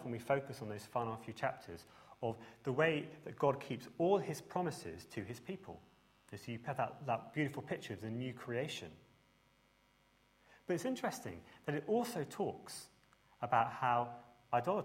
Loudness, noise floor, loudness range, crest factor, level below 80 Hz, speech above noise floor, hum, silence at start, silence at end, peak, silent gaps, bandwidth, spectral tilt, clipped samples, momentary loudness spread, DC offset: -40 LUFS; -72 dBFS; 6 LU; 22 dB; -74 dBFS; 33 dB; none; 0 s; 0 s; -18 dBFS; none; 16 kHz; -5.5 dB/octave; under 0.1%; 16 LU; under 0.1%